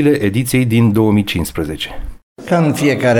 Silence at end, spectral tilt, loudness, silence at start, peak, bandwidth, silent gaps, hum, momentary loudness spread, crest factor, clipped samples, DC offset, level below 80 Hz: 0 s; -6 dB/octave; -15 LUFS; 0 s; -2 dBFS; 18.5 kHz; 2.23-2.36 s; none; 15 LU; 12 dB; under 0.1%; under 0.1%; -34 dBFS